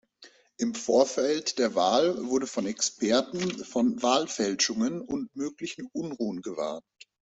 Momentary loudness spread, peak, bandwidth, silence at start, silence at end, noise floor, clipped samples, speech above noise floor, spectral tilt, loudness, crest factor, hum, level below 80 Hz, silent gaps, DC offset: 11 LU; -8 dBFS; 8.2 kHz; 0.2 s; 0.6 s; -56 dBFS; under 0.1%; 29 dB; -3.5 dB/octave; -28 LUFS; 20 dB; none; -68 dBFS; none; under 0.1%